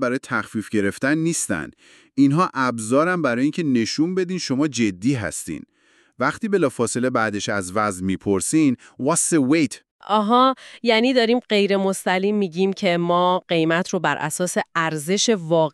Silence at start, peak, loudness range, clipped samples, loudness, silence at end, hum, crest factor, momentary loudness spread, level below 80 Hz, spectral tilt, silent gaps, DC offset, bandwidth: 0 s; -4 dBFS; 4 LU; under 0.1%; -21 LUFS; 0.05 s; none; 16 dB; 7 LU; -62 dBFS; -4.5 dB/octave; 9.91-9.99 s; under 0.1%; 13.5 kHz